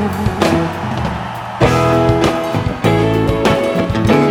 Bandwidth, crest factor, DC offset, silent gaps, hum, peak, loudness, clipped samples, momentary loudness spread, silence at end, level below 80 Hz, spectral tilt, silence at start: 18 kHz; 14 dB; under 0.1%; none; none; 0 dBFS; -15 LUFS; under 0.1%; 7 LU; 0 s; -30 dBFS; -6.5 dB/octave; 0 s